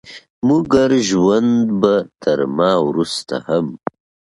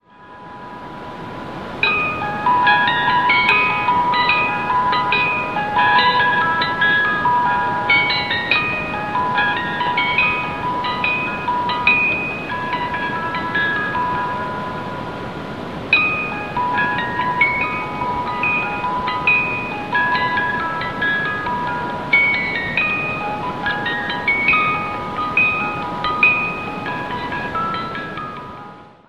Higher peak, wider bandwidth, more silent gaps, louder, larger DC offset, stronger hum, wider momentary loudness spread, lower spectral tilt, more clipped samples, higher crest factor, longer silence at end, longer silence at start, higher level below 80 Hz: about the same, 0 dBFS vs 0 dBFS; about the same, 11.5 kHz vs 12 kHz; first, 0.30-0.42 s vs none; about the same, -16 LUFS vs -17 LUFS; second, under 0.1% vs 0.5%; neither; second, 8 LU vs 12 LU; about the same, -5.5 dB/octave vs -5 dB/octave; neither; about the same, 16 dB vs 20 dB; first, 0.6 s vs 0.15 s; about the same, 0.05 s vs 0.1 s; about the same, -50 dBFS vs -48 dBFS